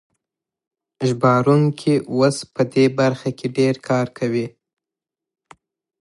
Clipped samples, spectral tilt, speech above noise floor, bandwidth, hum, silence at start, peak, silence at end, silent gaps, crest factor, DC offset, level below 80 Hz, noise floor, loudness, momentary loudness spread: under 0.1%; -6.5 dB/octave; 69 dB; 11.5 kHz; none; 1 s; -2 dBFS; 1.5 s; none; 18 dB; under 0.1%; -64 dBFS; -87 dBFS; -19 LUFS; 8 LU